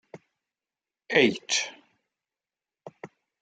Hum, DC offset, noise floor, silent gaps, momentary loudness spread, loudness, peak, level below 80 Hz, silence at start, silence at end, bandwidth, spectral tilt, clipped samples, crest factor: none; under 0.1%; under -90 dBFS; none; 25 LU; -25 LUFS; -6 dBFS; -80 dBFS; 0.15 s; 0.35 s; 9.6 kHz; -2.5 dB/octave; under 0.1%; 24 dB